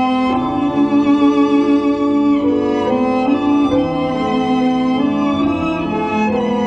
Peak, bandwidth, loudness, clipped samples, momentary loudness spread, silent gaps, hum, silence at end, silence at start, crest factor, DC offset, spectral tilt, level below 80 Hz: -4 dBFS; 7.4 kHz; -15 LUFS; under 0.1%; 4 LU; none; none; 0 s; 0 s; 12 dB; under 0.1%; -7 dB/octave; -44 dBFS